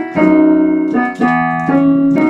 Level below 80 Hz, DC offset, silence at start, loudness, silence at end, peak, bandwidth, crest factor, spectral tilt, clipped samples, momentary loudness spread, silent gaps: -48 dBFS; under 0.1%; 0 s; -12 LUFS; 0 s; 0 dBFS; 7.2 kHz; 12 dB; -8.5 dB/octave; under 0.1%; 4 LU; none